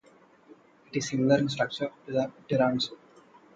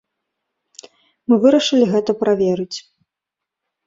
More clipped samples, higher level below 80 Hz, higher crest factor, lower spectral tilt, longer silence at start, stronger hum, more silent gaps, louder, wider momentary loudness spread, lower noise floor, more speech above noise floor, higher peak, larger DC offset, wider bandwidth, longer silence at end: neither; about the same, -66 dBFS vs -62 dBFS; about the same, 20 dB vs 18 dB; about the same, -5.5 dB/octave vs -5.5 dB/octave; second, 0.95 s vs 1.3 s; neither; neither; second, -28 LUFS vs -16 LUFS; second, 9 LU vs 16 LU; second, -58 dBFS vs -84 dBFS; second, 31 dB vs 68 dB; second, -10 dBFS vs -2 dBFS; neither; first, 9 kHz vs 7.8 kHz; second, 0.6 s vs 1.05 s